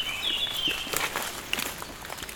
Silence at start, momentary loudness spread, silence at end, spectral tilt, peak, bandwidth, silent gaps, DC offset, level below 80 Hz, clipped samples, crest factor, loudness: 0 s; 11 LU; 0 s; -0.5 dB/octave; -8 dBFS; 18 kHz; none; under 0.1%; -52 dBFS; under 0.1%; 22 dB; -29 LUFS